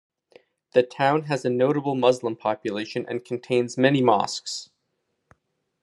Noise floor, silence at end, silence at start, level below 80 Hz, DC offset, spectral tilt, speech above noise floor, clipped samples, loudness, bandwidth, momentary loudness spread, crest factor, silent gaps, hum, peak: -76 dBFS; 1.2 s; 0.75 s; -74 dBFS; under 0.1%; -5.5 dB/octave; 53 dB; under 0.1%; -24 LUFS; 11.5 kHz; 10 LU; 20 dB; none; none; -4 dBFS